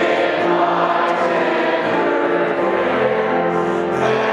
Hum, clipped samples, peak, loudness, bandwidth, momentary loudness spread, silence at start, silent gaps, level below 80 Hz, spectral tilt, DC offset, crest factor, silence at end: none; under 0.1%; -4 dBFS; -17 LUFS; 10.5 kHz; 2 LU; 0 s; none; -62 dBFS; -6 dB/octave; under 0.1%; 12 dB; 0 s